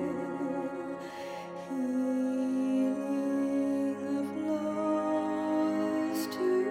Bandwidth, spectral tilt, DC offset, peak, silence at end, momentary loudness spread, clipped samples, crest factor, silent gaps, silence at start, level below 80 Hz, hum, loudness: 16.5 kHz; -6 dB/octave; under 0.1%; -20 dBFS; 0 s; 9 LU; under 0.1%; 12 dB; none; 0 s; -74 dBFS; none; -32 LUFS